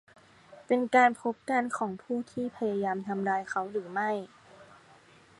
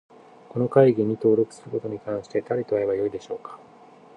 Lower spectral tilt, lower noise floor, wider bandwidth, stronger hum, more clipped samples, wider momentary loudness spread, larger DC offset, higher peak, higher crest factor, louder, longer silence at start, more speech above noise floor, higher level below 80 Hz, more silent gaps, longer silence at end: second, -5.5 dB/octave vs -8.5 dB/octave; first, -58 dBFS vs -50 dBFS; first, 11.5 kHz vs 9.6 kHz; neither; neither; second, 12 LU vs 16 LU; neither; second, -8 dBFS vs -4 dBFS; about the same, 22 dB vs 22 dB; second, -30 LUFS vs -24 LUFS; about the same, 0.5 s vs 0.55 s; about the same, 28 dB vs 27 dB; second, -76 dBFS vs -64 dBFS; neither; first, 0.75 s vs 0.6 s